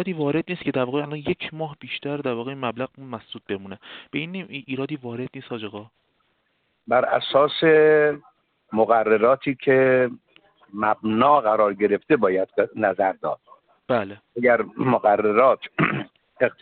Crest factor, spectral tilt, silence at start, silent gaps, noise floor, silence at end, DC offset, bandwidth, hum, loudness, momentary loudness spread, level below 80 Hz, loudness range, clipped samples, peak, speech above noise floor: 18 dB; -4 dB/octave; 0 s; none; -70 dBFS; 0.1 s; under 0.1%; 4.6 kHz; none; -22 LUFS; 16 LU; -62 dBFS; 12 LU; under 0.1%; -4 dBFS; 48 dB